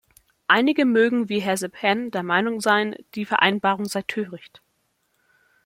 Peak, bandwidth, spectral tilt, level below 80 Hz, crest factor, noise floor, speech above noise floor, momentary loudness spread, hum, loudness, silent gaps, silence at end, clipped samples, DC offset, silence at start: -2 dBFS; 16.5 kHz; -4 dB/octave; -70 dBFS; 22 dB; -70 dBFS; 48 dB; 12 LU; none; -21 LUFS; none; 1.3 s; under 0.1%; under 0.1%; 0.5 s